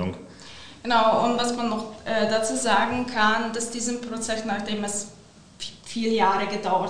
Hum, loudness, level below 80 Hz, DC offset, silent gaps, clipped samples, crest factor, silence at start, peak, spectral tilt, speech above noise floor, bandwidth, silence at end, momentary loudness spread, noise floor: none; -24 LUFS; -56 dBFS; 0.8%; none; under 0.1%; 18 dB; 0 s; -6 dBFS; -3 dB/octave; 20 dB; 10.5 kHz; 0 s; 16 LU; -44 dBFS